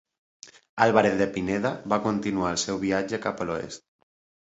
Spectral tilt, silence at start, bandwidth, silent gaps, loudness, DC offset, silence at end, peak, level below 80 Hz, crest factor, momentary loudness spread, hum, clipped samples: -4.5 dB/octave; 0.45 s; 8.2 kHz; 0.69-0.77 s; -25 LUFS; under 0.1%; 0.65 s; -4 dBFS; -56 dBFS; 22 dB; 12 LU; none; under 0.1%